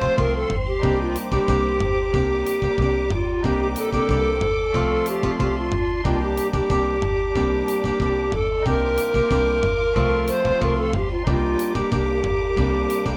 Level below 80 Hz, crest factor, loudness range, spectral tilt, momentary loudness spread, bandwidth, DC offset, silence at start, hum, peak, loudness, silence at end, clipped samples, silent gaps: -28 dBFS; 16 dB; 1 LU; -7 dB/octave; 3 LU; 19 kHz; under 0.1%; 0 s; none; -6 dBFS; -22 LUFS; 0 s; under 0.1%; none